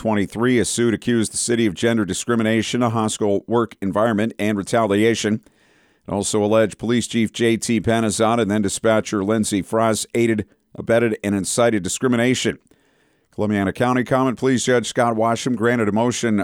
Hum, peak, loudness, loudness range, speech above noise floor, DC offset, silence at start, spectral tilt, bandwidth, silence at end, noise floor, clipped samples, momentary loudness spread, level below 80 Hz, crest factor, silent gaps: none; -6 dBFS; -19 LUFS; 2 LU; 42 dB; under 0.1%; 0 s; -4.5 dB/octave; 16.5 kHz; 0 s; -61 dBFS; under 0.1%; 4 LU; -54 dBFS; 14 dB; none